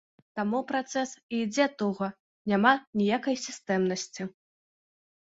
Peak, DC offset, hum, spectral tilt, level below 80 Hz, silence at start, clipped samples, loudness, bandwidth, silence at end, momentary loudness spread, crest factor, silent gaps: -8 dBFS; under 0.1%; none; -4.5 dB/octave; -72 dBFS; 0.35 s; under 0.1%; -29 LUFS; 8 kHz; 0.95 s; 13 LU; 22 dB; 1.23-1.29 s, 2.20-2.45 s, 2.87-2.93 s